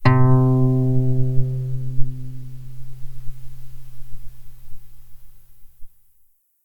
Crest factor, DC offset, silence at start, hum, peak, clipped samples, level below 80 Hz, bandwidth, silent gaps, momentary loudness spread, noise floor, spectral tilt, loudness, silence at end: 18 dB; under 0.1%; 0 s; none; -2 dBFS; under 0.1%; -32 dBFS; 5.2 kHz; none; 26 LU; -57 dBFS; -9.5 dB/octave; -20 LUFS; 0.8 s